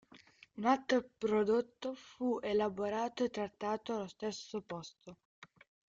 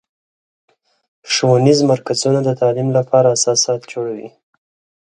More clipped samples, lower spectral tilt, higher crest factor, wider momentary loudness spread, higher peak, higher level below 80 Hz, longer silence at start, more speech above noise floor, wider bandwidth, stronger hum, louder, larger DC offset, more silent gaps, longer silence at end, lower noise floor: neither; about the same, -5 dB/octave vs -4.5 dB/octave; about the same, 20 dB vs 16 dB; about the same, 13 LU vs 12 LU; second, -16 dBFS vs 0 dBFS; second, -74 dBFS vs -64 dBFS; second, 0.15 s vs 1.25 s; second, 26 dB vs over 75 dB; second, 7.8 kHz vs 11 kHz; neither; second, -36 LUFS vs -15 LUFS; neither; first, 5.25-5.42 s vs none; second, 0.5 s vs 0.75 s; second, -62 dBFS vs under -90 dBFS